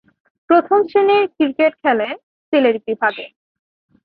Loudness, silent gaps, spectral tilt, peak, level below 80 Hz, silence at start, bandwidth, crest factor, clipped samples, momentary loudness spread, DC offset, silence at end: -16 LUFS; 2.23-2.52 s; -8 dB/octave; -2 dBFS; -66 dBFS; 0.5 s; 5 kHz; 16 dB; under 0.1%; 12 LU; under 0.1%; 0.8 s